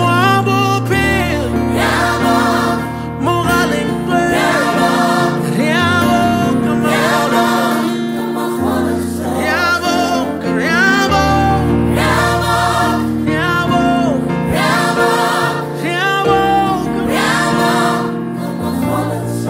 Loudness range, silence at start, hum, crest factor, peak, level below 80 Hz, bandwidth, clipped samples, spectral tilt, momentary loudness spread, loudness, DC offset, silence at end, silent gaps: 2 LU; 0 s; none; 12 dB; -2 dBFS; -34 dBFS; 16.5 kHz; under 0.1%; -5 dB/octave; 6 LU; -14 LUFS; under 0.1%; 0 s; none